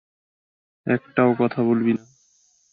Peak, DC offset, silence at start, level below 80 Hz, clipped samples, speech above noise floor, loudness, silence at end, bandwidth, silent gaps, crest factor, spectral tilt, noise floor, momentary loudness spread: -2 dBFS; under 0.1%; 0.85 s; -66 dBFS; under 0.1%; 41 dB; -21 LUFS; 0.75 s; 6.8 kHz; none; 20 dB; -8.5 dB/octave; -62 dBFS; 8 LU